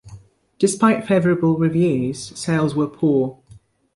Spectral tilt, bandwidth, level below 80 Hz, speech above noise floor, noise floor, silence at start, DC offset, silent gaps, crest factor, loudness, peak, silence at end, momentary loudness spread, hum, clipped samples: -6.5 dB/octave; 11.5 kHz; -56 dBFS; 31 dB; -49 dBFS; 0.05 s; under 0.1%; none; 16 dB; -19 LUFS; -4 dBFS; 0.65 s; 7 LU; none; under 0.1%